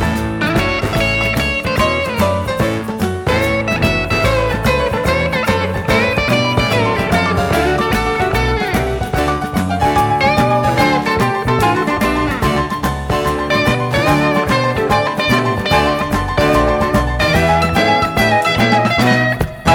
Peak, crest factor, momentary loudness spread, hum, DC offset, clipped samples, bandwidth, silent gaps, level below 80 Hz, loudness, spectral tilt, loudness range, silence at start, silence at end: 0 dBFS; 14 dB; 4 LU; none; under 0.1%; under 0.1%; 18 kHz; none; -28 dBFS; -15 LUFS; -5.5 dB/octave; 2 LU; 0 s; 0 s